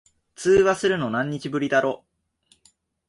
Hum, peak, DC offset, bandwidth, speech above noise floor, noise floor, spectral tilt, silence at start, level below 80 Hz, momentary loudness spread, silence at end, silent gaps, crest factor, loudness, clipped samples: none; -8 dBFS; under 0.1%; 11.5 kHz; 43 dB; -64 dBFS; -5 dB/octave; 0.4 s; -54 dBFS; 10 LU; 1.15 s; none; 16 dB; -22 LUFS; under 0.1%